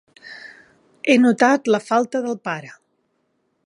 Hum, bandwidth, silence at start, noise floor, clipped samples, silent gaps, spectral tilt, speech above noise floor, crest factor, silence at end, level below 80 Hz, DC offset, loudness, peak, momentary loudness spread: none; 11 kHz; 0.25 s; -69 dBFS; under 0.1%; none; -4.5 dB/octave; 51 dB; 20 dB; 0.95 s; -74 dBFS; under 0.1%; -19 LUFS; -2 dBFS; 23 LU